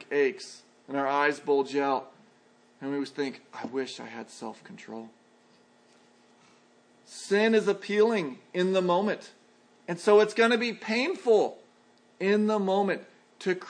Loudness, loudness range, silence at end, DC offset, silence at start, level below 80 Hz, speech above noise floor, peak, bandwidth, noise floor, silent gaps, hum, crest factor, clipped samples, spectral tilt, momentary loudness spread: -27 LUFS; 14 LU; 0 s; under 0.1%; 0 s; -86 dBFS; 34 dB; -8 dBFS; 10.5 kHz; -61 dBFS; none; none; 20 dB; under 0.1%; -5 dB/octave; 18 LU